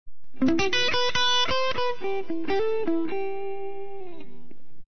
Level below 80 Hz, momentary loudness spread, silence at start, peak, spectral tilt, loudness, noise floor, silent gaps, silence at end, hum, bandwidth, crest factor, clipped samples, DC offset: -52 dBFS; 16 LU; 0.05 s; -12 dBFS; -3 dB/octave; -25 LUFS; -53 dBFS; none; 0 s; none; 6.6 kHz; 14 dB; under 0.1%; 5%